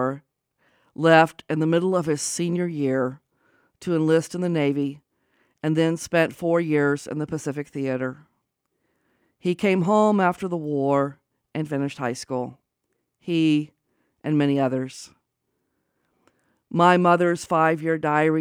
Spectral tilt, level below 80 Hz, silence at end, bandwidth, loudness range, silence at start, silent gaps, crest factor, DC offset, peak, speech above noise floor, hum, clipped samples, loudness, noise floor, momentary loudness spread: -6 dB/octave; -68 dBFS; 0 s; 16 kHz; 4 LU; 0 s; none; 20 dB; under 0.1%; -4 dBFS; 55 dB; none; under 0.1%; -23 LUFS; -76 dBFS; 12 LU